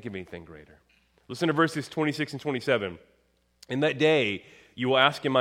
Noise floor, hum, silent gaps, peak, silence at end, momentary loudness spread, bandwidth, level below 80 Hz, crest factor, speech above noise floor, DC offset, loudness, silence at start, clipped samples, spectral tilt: -59 dBFS; none; none; -4 dBFS; 0 s; 18 LU; 15.5 kHz; -66 dBFS; 24 dB; 32 dB; under 0.1%; -26 LUFS; 0.05 s; under 0.1%; -5.5 dB/octave